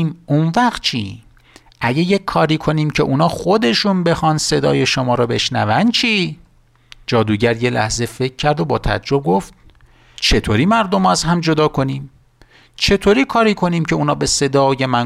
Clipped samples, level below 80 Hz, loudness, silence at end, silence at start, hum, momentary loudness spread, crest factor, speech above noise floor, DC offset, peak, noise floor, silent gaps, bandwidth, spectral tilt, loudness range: under 0.1%; -34 dBFS; -16 LUFS; 0 s; 0 s; none; 6 LU; 12 dB; 33 dB; under 0.1%; -4 dBFS; -49 dBFS; none; 14.5 kHz; -5 dB/octave; 3 LU